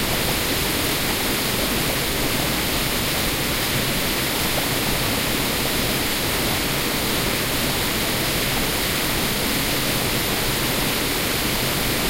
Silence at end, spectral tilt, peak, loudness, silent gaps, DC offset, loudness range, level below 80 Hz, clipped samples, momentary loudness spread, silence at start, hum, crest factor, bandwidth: 0 s; -3 dB/octave; -8 dBFS; -20 LUFS; none; under 0.1%; 0 LU; -34 dBFS; under 0.1%; 0 LU; 0 s; none; 14 dB; 16 kHz